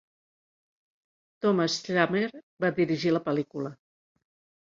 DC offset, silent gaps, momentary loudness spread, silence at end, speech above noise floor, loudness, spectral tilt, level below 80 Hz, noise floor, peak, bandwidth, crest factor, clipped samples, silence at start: under 0.1%; 2.43-2.57 s; 10 LU; 0.95 s; over 63 dB; -27 LUFS; -5.5 dB/octave; -70 dBFS; under -90 dBFS; -8 dBFS; 7.6 kHz; 22 dB; under 0.1%; 1.4 s